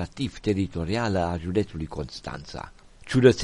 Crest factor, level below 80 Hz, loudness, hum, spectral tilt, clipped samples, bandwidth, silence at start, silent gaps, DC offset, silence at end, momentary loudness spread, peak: 22 dB; -44 dBFS; -27 LUFS; none; -6.5 dB/octave; under 0.1%; 11.5 kHz; 0 s; none; under 0.1%; 0 s; 15 LU; -2 dBFS